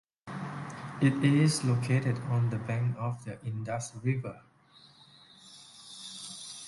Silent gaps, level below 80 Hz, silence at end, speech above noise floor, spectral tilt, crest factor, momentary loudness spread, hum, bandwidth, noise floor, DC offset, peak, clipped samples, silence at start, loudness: none; -66 dBFS; 0 s; 30 dB; -6 dB/octave; 20 dB; 19 LU; none; 11.5 kHz; -59 dBFS; under 0.1%; -12 dBFS; under 0.1%; 0.25 s; -31 LUFS